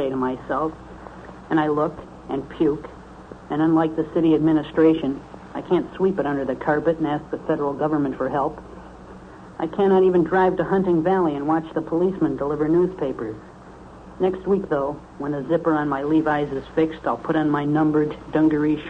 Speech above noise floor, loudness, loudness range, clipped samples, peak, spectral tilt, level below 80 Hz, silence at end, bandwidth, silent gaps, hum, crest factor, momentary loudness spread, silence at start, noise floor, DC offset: 21 dB; -22 LUFS; 4 LU; under 0.1%; -6 dBFS; -9 dB/octave; -48 dBFS; 0 s; 6.2 kHz; none; none; 16 dB; 21 LU; 0 s; -42 dBFS; under 0.1%